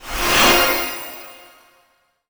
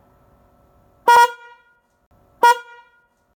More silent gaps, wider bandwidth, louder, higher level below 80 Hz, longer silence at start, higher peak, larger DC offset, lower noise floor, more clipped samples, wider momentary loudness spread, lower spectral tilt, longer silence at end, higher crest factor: second, none vs 2.06-2.11 s; about the same, over 20 kHz vs 19 kHz; about the same, -15 LUFS vs -15 LUFS; first, -38 dBFS vs -62 dBFS; second, 0 s vs 1.05 s; about the same, -2 dBFS vs -4 dBFS; neither; about the same, -61 dBFS vs -59 dBFS; neither; first, 21 LU vs 9 LU; first, -1.5 dB/octave vs 0 dB/octave; first, 0.95 s vs 0.8 s; about the same, 18 dB vs 16 dB